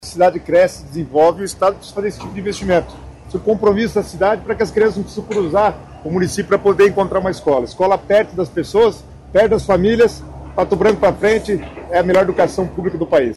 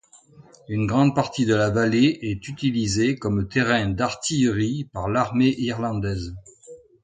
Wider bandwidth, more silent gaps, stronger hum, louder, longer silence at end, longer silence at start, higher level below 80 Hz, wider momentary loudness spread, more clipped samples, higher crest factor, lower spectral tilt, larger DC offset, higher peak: first, 12.5 kHz vs 9.4 kHz; neither; neither; first, -16 LUFS vs -22 LUFS; second, 0 s vs 0.25 s; second, 0.05 s vs 0.7 s; first, -38 dBFS vs -46 dBFS; about the same, 10 LU vs 9 LU; neither; second, 12 dB vs 18 dB; about the same, -6 dB/octave vs -5.5 dB/octave; neither; about the same, -4 dBFS vs -6 dBFS